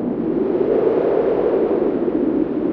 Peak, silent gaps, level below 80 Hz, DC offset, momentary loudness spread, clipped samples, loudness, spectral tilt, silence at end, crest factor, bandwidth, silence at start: -6 dBFS; none; -48 dBFS; under 0.1%; 3 LU; under 0.1%; -18 LUFS; -8 dB/octave; 0 s; 12 dB; 4.9 kHz; 0 s